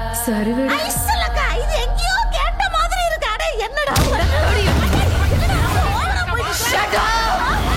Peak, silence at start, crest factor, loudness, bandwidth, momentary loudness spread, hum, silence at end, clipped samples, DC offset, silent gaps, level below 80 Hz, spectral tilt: -4 dBFS; 0 s; 14 dB; -18 LUFS; 16.5 kHz; 4 LU; none; 0 s; under 0.1%; under 0.1%; none; -22 dBFS; -4 dB/octave